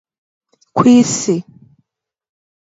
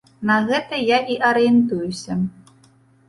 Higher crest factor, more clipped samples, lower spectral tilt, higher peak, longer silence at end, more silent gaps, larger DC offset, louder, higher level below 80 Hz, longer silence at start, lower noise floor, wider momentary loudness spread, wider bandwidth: about the same, 16 dB vs 16 dB; neither; about the same, -5 dB/octave vs -5.5 dB/octave; first, 0 dBFS vs -4 dBFS; first, 1.3 s vs 0.8 s; neither; neither; first, -13 LUFS vs -19 LUFS; about the same, -58 dBFS vs -56 dBFS; first, 0.75 s vs 0.2 s; first, -73 dBFS vs -54 dBFS; about the same, 12 LU vs 10 LU; second, 8 kHz vs 11.5 kHz